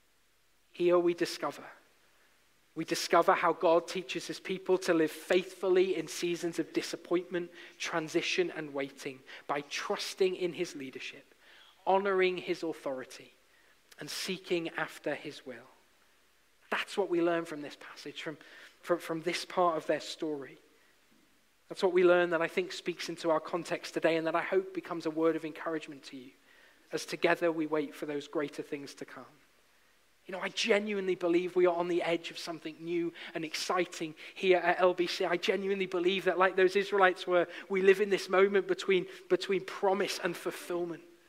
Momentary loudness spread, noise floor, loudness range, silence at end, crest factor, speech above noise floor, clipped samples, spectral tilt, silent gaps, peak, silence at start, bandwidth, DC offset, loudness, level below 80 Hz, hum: 15 LU; -71 dBFS; 8 LU; 0.2 s; 22 dB; 40 dB; under 0.1%; -4.5 dB/octave; none; -10 dBFS; 0.75 s; 15.5 kHz; under 0.1%; -32 LUFS; -84 dBFS; none